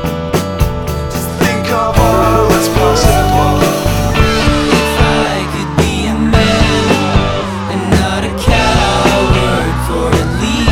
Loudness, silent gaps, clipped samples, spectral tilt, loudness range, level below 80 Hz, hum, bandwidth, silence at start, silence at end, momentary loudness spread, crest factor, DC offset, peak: -12 LUFS; none; under 0.1%; -5 dB/octave; 2 LU; -20 dBFS; none; 19.5 kHz; 0 s; 0 s; 6 LU; 12 dB; under 0.1%; 0 dBFS